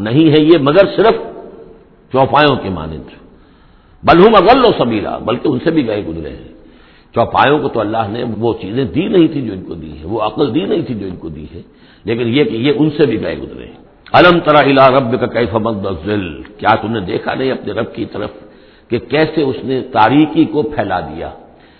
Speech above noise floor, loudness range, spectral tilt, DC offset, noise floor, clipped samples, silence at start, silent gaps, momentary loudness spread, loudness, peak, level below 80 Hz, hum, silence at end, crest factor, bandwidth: 32 dB; 6 LU; -9 dB/octave; under 0.1%; -45 dBFS; 0.2%; 0 s; none; 18 LU; -13 LUFS; 0 dBFS; -40 dBFS; none; 0.4 s; 14 dB; 5.4 kHz